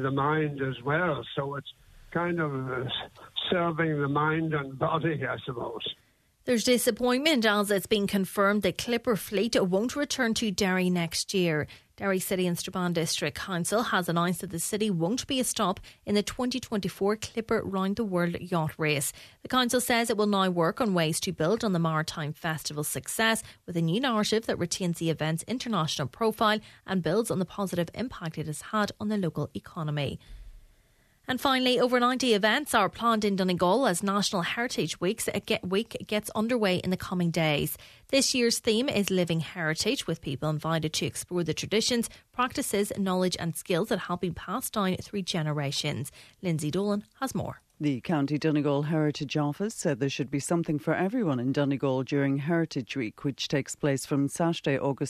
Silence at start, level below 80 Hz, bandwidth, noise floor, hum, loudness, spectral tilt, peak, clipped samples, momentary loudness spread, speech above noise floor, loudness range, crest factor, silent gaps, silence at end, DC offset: 0 s; -58 dBFS; 14 kHz; -64 dBFS; none; -28 LUFS; -4.5 dB/octave; -8 dBFS; under 0.1%; 8 LU; 36 dB; 4 LU; 20 dB; none; 0 s; under 0.1%